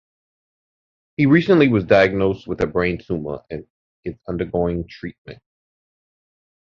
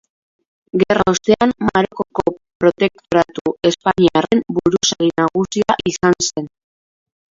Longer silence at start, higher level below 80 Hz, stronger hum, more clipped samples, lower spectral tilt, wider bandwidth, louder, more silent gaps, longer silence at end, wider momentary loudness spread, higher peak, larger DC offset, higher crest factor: first, 1.2 s vs 0.75 s; about the same, -44 dBFS vs -48 dBFS; neither; neither; first, -8.5 dB/octave vs -4.5 dB/octave; second, 7 kHz vs 7.8 kHz; about the same, -19 LUFS vs -17 LUFS; first, 3.70-4.03 s, 5.18-5.25 s vs 2.55-2.60 s, 3.41-3.45 s; first, 1.4 s vs 0.9 s; first, 19 LU vs 6 LU; about the same, -2 dBFS vs 0 dBFS; neither; about the same, 20 dB vs 18 dB